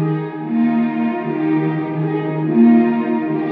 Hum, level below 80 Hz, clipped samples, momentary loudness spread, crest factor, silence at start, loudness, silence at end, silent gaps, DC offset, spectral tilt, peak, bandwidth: none; -70 dBFS; under 0.1%; 9 LU; 14 dB; 0 s; -17 LUFS; 0 s; none; under 0.1%; -8 dB/octave; -2 dBFS; 4.2 kHz